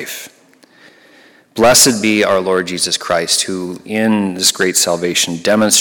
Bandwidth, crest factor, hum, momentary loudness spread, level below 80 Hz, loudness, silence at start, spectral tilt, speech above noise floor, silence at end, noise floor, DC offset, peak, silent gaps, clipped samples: 17.5 kHz; 16 dB; none; 12 LU; -50 dBFS; -13 LUFS; 0 s; -2 dB/octave; 33 dB; 0 s; -47 dBFS; under 0.1%; 0 dBFS; none; under 0.1%